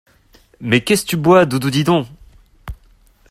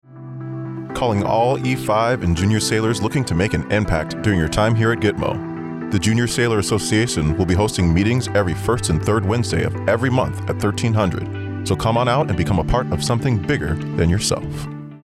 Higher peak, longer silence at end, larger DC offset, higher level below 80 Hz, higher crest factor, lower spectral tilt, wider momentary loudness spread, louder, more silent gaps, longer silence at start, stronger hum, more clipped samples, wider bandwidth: first, 0 dBFS vs -6 dBFS; first, 0.55 s vs 0.05 s; neither; second, -44 dBFS vs -36 dBFS; about the same, 16 dB vs 12 dB; about the same, -5.5 dB/octave vs -5.5 dB/octave; first, 24 LU vs 9 LU; first, -15 LUFS vs -19 LUFS; neither; first, 0.6 s vs 0.1 s; neither; neither; first, 16 kHz vs 14.5 kHz